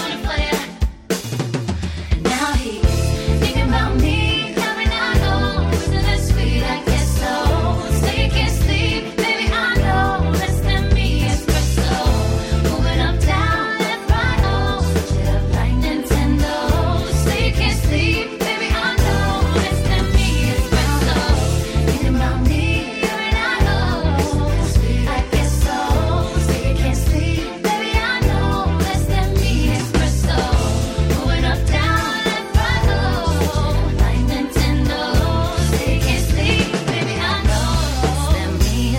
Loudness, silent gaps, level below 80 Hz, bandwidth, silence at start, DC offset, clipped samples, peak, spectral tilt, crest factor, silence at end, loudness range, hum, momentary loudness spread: -18 LUFS; none; -20 dBFS; 16.5 kHz; 0 s; under 0.1%; under 0.1%; -2 dBFS; -5 dB/octave; 16 dB; 0 s; 1 LU; none; 3 LU